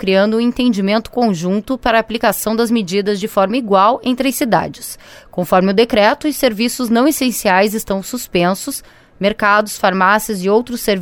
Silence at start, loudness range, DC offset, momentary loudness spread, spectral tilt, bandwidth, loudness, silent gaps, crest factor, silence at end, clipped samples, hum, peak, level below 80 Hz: 0 s; 1 LU; under 0.1%; 8 LU; -4.5 dB/octave; 18 kHz; -15 LUFS; none; 14 dB; 0 s; under 0.1%; none; 0 dBFS; -44 dBFS